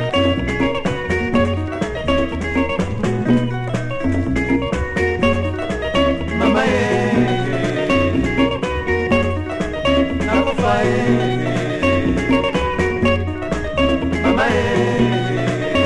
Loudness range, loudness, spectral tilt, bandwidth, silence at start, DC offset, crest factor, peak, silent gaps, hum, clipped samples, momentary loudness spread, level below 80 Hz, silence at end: 2 LU; -18 LUFS; -6.5 dB/octave; 11.5 kHz; 0 s; under 0.1%; 16 dB; -2 dBFS; none; none; under 0.1%; 5 LU; -32 dBFS; 0 s